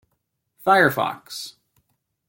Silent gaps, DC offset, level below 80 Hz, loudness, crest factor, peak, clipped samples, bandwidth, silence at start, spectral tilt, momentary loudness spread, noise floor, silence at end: none; under 0.1%; -64 dBFS; -19 LUFS; 20 dB; -4 dBFS; under 0.1%; 17 kHz; 0.65 s; -4.5 dB/octave; 17 LU; -75 dBFS; 0.8 s